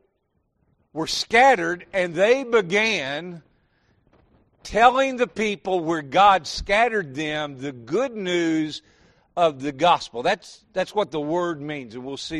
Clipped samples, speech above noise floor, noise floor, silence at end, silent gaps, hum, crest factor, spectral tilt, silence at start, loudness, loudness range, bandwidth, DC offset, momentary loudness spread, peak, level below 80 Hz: under 0.1%; 49 dB; -71 dBFS; 0 s; none; none; 20 dB; -4 dB/octave; 0.95 s; -22 LUFS; 4 LU; 12.5 kHz; under 0.1%; 15 LU; -2 dBFS; -52 dBFS